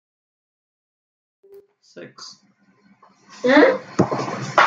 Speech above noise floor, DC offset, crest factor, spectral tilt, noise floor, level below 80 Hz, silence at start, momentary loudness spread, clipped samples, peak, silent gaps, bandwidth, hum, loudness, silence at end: 38 dB; under 0.1%; 20 dB; -5.5 dB/octave; -57 dBFS; -68 dBFS; 1.95 s; 26 LU; under 0.1%; -2 dBFS; none; 7.8 kHz; none; -18 LUFS; 0 s